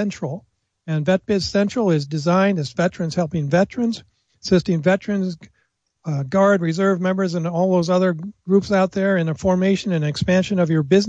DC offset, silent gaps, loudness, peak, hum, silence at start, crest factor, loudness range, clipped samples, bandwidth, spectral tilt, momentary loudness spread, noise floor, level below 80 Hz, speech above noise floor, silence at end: under 0.1%; none; -20 LUFS; -4 dBFS; none; 0 s; 16 dB; 2 LU; under 0.1%; 8 kHz; -6.5 dB/octave; 10 LU; -68 dBFS; -52 dBFS; 49 dB; 0 s